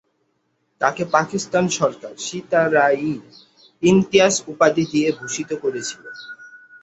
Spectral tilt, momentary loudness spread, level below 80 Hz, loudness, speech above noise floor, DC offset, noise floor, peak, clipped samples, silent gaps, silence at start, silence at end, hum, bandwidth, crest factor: -4.5 dB/octave; 15 LU; -60 dBFS; -19 LUFS; 49 dB; under 0.1%; -69 dBFS; -2 dBFS; under 0.1%; none; 0.8 s; 0.25 s; none; 8.2 kHz; 18 dB